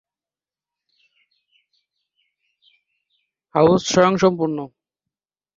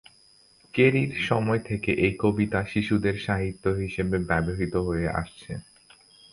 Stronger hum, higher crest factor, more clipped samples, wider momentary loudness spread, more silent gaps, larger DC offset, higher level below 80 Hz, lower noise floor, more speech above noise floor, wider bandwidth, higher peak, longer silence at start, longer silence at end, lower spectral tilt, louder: first, 50 Hz at -60 dBFS vs none; about the same, 22 dB vs 20 dB; neither; first, 13 LU vs 10 LU; neither; neither; second, -58 dBFS vs -44 dBFS; first, under -90 dBFS vs -58 dBFS; first, over 73 dB vs 33 dB; second, 7.6 kHz vs 11 kHz; first, -2 dBFS vs -8 dBFS; first, 3.55 s vs 0.75 s; first, 0.9 s vs 0.7 s; second, -5.5 dB/octave vs -7 dB/octave; first, -18 LUFS vs -26 LUFS